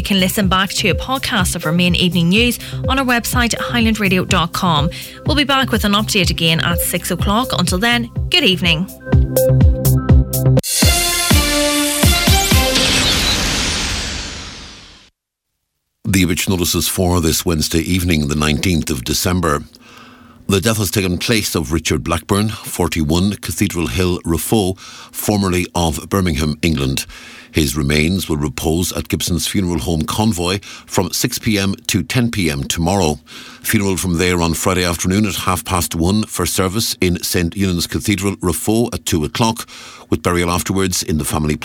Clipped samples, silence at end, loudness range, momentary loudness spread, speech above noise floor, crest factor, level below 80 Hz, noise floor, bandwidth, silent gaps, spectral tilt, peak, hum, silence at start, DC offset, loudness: under 0.1%; 0 s; 5 LU; 7 LU; 60 dB; 16 dB; -28 dBFS; -76 dBFS; 19 kHz; none; -4 dB/octave; 0 dBFS; none; 0 s; under 0.1%; -16 LUFS